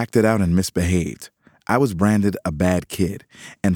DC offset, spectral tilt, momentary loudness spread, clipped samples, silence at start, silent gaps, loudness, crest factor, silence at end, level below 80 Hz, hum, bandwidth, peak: under 0.1%; -6.5 dB/octave; 17 LU; under 0.1%; 0 s; none; -20 LUFS; 18 dB; 0 s; -40 dBFS; none; 18.5 kHz; -2 dBFS